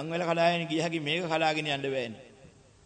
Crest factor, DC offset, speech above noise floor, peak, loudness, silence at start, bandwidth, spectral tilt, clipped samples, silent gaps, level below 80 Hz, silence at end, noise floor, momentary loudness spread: 18 dB; under 0.1%; 27 dB; -12 dBFS; -29 LUFS; 0 s; 9.4 kHz; -5 dB/octave; under 0.1%; none; -70 dBFS; 0.35 s; -56 dBFS; 8 LU